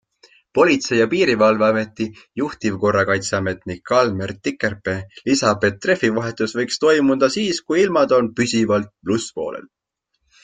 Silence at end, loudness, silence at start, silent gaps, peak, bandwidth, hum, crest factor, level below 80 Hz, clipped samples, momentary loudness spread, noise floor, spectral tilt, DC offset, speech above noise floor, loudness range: 0.85 s; -19 LUFS; 0.55 s; none; -2 dBFS; 9.6 kHz; none; 18 dB; -56 dBFS; under 0.1%; 11 LU; -74 dBFS; -4.5 dB/octave; under 0.1%; 55 dB; 3 LU